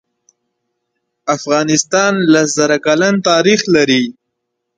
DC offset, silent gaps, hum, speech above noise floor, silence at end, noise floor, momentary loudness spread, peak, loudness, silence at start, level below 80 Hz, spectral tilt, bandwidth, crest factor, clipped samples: under 0.1%; none; none; 61 dB; 0.65 s; -73 dBFS; 8 LU; 0 dBFS; -12 LUFS; 1.25 s; -58 dBFS; -3.5 dB/octave; 9.4 kHz; 14 dB; under 0.1%